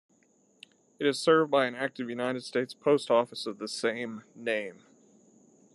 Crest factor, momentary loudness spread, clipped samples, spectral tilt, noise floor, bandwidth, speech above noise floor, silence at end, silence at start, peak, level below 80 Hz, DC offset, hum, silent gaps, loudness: 20 dB; 12 LU; under 0.1%; -4.5 dB/octave; -66 dBFS; 12 kHz; 38 dB; 1 s; 1 s; -12 dBFS; -84 dBFS; under 0.1%; none; none; -29 LUFS